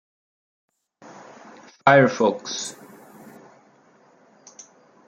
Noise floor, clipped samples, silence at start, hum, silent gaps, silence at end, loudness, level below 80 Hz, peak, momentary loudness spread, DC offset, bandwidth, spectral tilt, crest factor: -56 dBFS; under 0.1%; 1.85 s; none; none; 2.35 s; -20 LUFS; -68 dBFS; -2 dBFS; 25 LU; under 0.1%; 15 kHz; -4.5 dB/octave; 24 dB